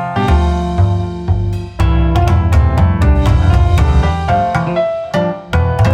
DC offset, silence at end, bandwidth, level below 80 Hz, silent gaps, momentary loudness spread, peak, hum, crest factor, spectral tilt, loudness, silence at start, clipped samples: under 0.1%; 0 s; 9.2 kHz; -16 dBFS; none; 6 LU; -2 dBFS; none; 10 dB; -7.5 dB/octave; -14 LUFS; 0 s; under 0.1%